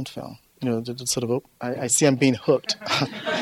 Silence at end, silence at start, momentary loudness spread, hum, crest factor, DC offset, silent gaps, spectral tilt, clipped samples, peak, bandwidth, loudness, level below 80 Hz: 0 s; 0 s; 13 LU; none; 20 dB; under 0.1%; none; -4 dB/octave; under 0.1%; -4 dBFS; 16 kHz; -23 LUFS; -62 dBFS